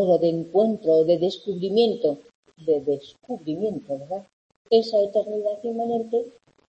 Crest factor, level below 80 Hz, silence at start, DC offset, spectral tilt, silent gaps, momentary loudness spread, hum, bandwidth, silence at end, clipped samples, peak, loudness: 16 dB; -68 dBFS; 0 s; under 0.1%; -7.5 dB/octave; 2.35-2.43 s, 4.33-4.50 s, 4.56-4.65 s; 13 LU; none; 8 kHz; 0.4 s; under 0.1%; -8 dBFS; -24 LUFS